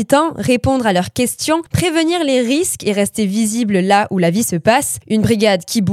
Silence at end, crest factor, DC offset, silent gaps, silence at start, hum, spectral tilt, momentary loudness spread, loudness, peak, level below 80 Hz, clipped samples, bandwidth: 0 s; 14 dB; under 0.1%; none; 0 s; none; -4.5 dB/octave; 4 LU; -15 LUFS; 0 dBFS; -44 dBFS; under 0.1%; 16 kHz